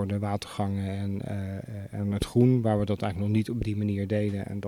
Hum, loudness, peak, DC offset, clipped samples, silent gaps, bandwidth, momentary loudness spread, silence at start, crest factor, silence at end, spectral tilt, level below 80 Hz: none; -28 LUFS; -10 dBFS; under 0.1%; under 0.1%; none; 13 kHz; 11 LU; 0 s; 18 dB; 0 s; -8 dB/octave; -48 dBFS